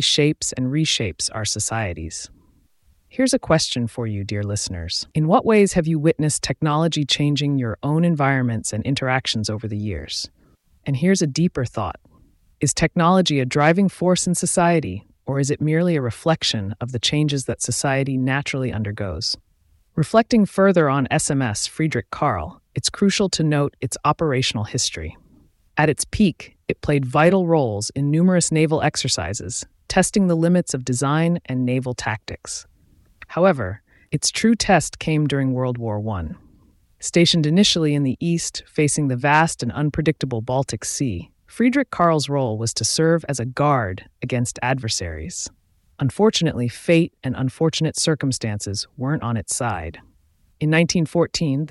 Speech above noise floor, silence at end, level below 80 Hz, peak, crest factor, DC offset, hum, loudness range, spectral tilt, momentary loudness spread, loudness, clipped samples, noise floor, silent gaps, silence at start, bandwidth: 39 dB; 0 s; -46 dBFS; -2 dBFS; 18 dB; under 0.1%; none; 4 LU; -4.5 dB/octave; 11 LU; -20 LUFS; under 0.1%; -59 dBFS; none; 0 s; 12 kHz